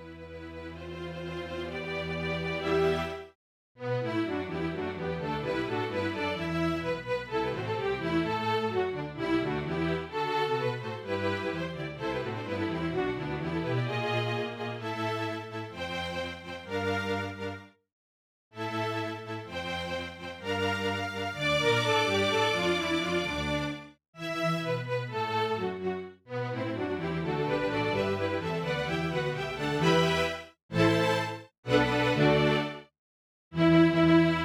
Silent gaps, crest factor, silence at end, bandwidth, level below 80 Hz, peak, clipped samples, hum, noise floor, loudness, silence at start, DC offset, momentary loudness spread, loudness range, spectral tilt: 3.35-3.75 s, 17.92-18.51 s, 24.08-24.13 s, 30.62-30.69 s, 31.58-31.63 s, 32.99-33.51 s; 20 dB; 0 s; 15 kHz; -54 dBFS; -10 dBFS; under 0.1%; none; under -90 dBFS; -30 LUFS; 0 s; under 0.1%; 13 LU; 7 LU; -6 dB/octave